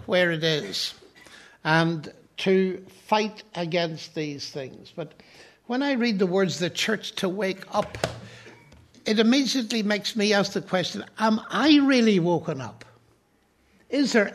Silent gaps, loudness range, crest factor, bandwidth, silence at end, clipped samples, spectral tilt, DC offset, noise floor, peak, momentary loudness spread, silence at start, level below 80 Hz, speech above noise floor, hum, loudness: none; 5 LU; 20 dB; 13.5 kHz; 0 s; under 0.1%; -4.5 dB/octave; under 0.1%; -64 dBFS; -4 dBFS; 14 LU; 0.05 s; -64 dBFS; 40 dB; none; -24 LUFS